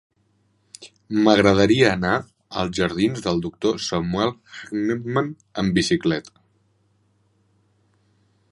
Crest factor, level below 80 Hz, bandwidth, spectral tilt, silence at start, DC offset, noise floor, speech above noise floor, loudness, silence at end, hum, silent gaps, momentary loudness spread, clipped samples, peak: 22 dB; -48 dBFS; 11.5 kHz; -5.5 dB/octave; 0.8 s; under 0.1%; -65 dBFS; 44 dB; -21 LUFS; 2.25 s; none; none; 14 LU; under 0.1%; 0 dBFS